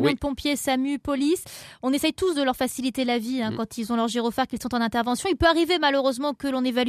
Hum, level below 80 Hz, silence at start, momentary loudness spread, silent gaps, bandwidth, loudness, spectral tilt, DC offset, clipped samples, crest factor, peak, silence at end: none; -48 dBFS; 0 s; 7 LU; none; 14.5 kHz; -24 LUFS; -4 dB/octave; under 0.1%; under 0.1%; 18 dB; -6 dBFS; 0 s